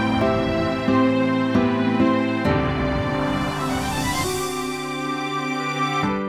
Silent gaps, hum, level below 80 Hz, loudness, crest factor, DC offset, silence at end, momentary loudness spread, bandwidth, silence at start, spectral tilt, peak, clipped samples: none; none; -40 dBFS; -22 LUFS; 14 dB; under 0.1%; 0 s; 6 LU; 16 kHz; 0 s; -5.5 dB/octave; -6 dBFS; under 0.1%